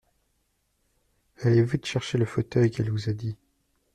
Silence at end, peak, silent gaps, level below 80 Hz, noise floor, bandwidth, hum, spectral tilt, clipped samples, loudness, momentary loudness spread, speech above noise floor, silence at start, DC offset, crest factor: 0.6 s; -10 dBFS; none; -56 dBFS; -73 dBFS; 10 kHz; none; -7 dB/octave; under 0.1%; -26 LUFS; 10 LU; 48 dB; 1.4 s; under 0.1%; 16 dB